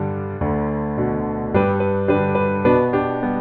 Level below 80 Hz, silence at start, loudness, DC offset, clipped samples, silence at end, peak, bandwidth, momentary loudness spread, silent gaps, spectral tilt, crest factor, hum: -40 dBFS; 0 s; -20 LUFS; under 0.1%; under 0.1%; 0 s; -4 dBFS; 4.5 kHz; 6 LU; none; -11 dB/octave; 16 dB; none